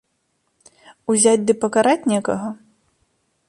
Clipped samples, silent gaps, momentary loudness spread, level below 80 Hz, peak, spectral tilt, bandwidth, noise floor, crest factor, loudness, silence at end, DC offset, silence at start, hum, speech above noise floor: under 0.1%; none; 16 LU; -62 dBFS; -4 dBFS; -4 dB/octave; 11.5 kHz; -69 dBFS; 18 dB; -18 LUFS; 0.95 s; under 0.1%; 1.1 s; none; 52 dB